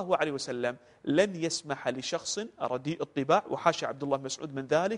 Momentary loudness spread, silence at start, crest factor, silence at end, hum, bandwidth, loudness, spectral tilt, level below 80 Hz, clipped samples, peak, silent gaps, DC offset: 7 LU; 0 s; 22 dB; 0 s; none; 10.5 kHz; -31 LUFS; -4 dB/octave; -70 dBFS; under 0.1%; -8 dBFS; none; under 0.1%